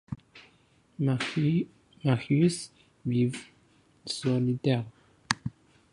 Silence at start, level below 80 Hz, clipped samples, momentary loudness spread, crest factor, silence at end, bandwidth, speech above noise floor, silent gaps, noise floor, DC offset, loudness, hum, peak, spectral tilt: 0.1 s; -62 dBFS; under 0.1%; 17 LU; 26 dB; 0.45 s; 11.5 kHz; 37 dB; none; -64 dBFS; under 0.1%; -29 LUFS; none; -4 dBFS; -6 dB/octave